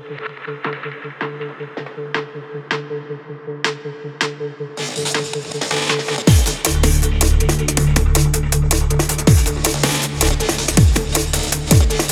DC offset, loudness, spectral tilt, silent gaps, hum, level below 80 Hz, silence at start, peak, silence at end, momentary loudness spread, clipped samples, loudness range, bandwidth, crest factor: under 0.1%; -18 LUFS; -4 dB/octave; none; none; -22 dBFS; 0 s; 0 dBFS; 0 s; 15 LU; under 0.1%; 10 LU; 19 kHz; 16 dB